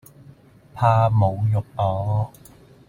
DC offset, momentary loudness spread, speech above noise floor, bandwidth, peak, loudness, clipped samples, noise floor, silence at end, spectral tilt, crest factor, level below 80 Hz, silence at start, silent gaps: under 0.1%; 8 LU; 29 dB; 10.5 kHz; -6 dBFS; -21 LUFS; under 0.1%; -49 dBFS; 0.6 s; -8.5 dB/octave; 16 dB; -50 dBFS; 0.75 s; none